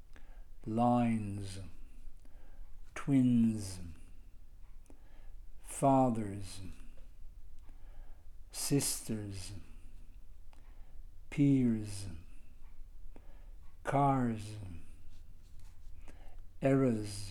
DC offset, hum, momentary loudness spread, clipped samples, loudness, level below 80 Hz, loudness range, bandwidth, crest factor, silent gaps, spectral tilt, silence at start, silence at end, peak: under 0.1%; none; 21 LU; under 0.1%; -33 LUFS; -50 dBFS; 5 LU; 16.5 kHz; 18 dB; none; -6 dB/octave; 0 s; 0 s; -16 dBFS